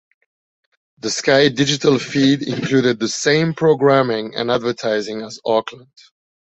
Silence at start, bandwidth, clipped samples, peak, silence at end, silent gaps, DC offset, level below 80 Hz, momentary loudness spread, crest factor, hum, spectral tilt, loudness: 1.05 s; 8.2 kHz; under 0.1%; -2 dBFS; 0.8 s; none; under 0.1%; -58 dBFS; 8 LU; 16 dB; none; -4.5 dB/octave; -17 LUFS